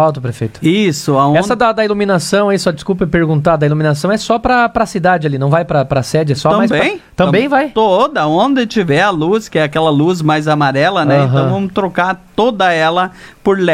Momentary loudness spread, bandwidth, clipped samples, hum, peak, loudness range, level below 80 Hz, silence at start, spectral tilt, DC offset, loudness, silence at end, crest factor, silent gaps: 4 LU; 15 kHz; under 0.1%; none; 0 dBFS; 1 LU; -42 dBFS; 0 s; -6 dB/octave; under 0.1%; -13 LUFS; 0 s; 12 dB; none